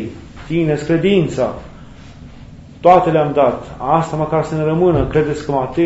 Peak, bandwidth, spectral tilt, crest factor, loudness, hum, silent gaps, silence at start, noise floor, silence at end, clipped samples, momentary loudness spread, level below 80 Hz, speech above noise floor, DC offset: 0 dBFS; 8 kHz; -7.5 dB/octave; 16 dB; -16 LUFS; none; none; 0 s; -37 dBFS; 0 s; under 0.1%; 10 LU; -38 dBFS; 22 dB; under 0.1%